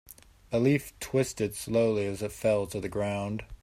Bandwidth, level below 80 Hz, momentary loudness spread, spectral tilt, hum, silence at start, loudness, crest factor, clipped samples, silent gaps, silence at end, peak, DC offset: 16 kHz; -54 dBFS; 7 LU; -6 dB/octave; none; 0.5 s; -29 LUFS; 16 dB; under 0.1%; none; 0.1 s; -12 dBFS; under 0.1%